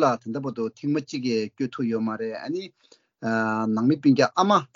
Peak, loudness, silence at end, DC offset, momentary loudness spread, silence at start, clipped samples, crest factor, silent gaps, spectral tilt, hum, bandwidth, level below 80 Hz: -6 dBFS; -25 LUFS; 0.1 s; under 0.1%; 12 LU; 0 s; under 0.1%; 18 dB; none; -6 dB/octave; none; 7.6 kHz; -72 dBFS